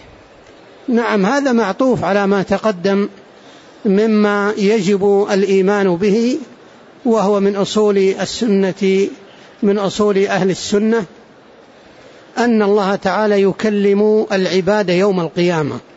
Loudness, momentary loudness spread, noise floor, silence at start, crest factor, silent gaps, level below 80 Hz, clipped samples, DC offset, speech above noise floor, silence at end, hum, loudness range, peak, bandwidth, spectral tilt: -15 LUFS; 5 LU; -43 dBFS; 0.9 s; 12 dB; none; -54 dBFS; under 0.1%; under 0.1%; 29 dB; 0.15 s; none; 3 LU; -4 dBFS; 8 kHz; -6 dB/octave